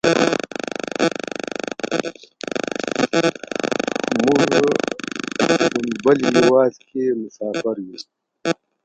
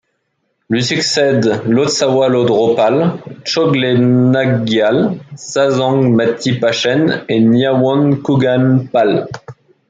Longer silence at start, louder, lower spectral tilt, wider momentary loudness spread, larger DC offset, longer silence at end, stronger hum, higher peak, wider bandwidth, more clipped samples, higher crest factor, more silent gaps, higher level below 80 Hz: second, 0.05 s vs 0.7 s; second, -20 LUFS vs -13 LUFS; about the same, -4.5 dB/octave vs -5.5 dB/octave; first, 12 LU vs 7 LU; neither; about the same, 0.3 s vs 0.4 s; neither; about the same, 0 dBFS vs -2 dBFS; about the same, 9.2 kHz vs 9.4 kHz; neither; first, 20 dB vs 12 dB; neither; about the same, -60 dBFS vs -56 dBFS